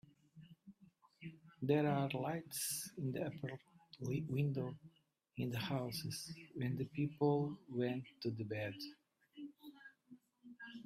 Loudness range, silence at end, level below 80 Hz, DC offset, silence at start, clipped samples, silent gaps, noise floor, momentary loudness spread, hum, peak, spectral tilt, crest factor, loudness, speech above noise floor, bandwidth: 3 LU; 0 s; -76 dBFS; under 0.1%; 0.35 s; under 0.1%; none; -72 dBFS; 22 LU; none; -22 dBFS; -5.5 dB/octave; 20 dB; -41 LUFS; 32 dB; 15.5 kHz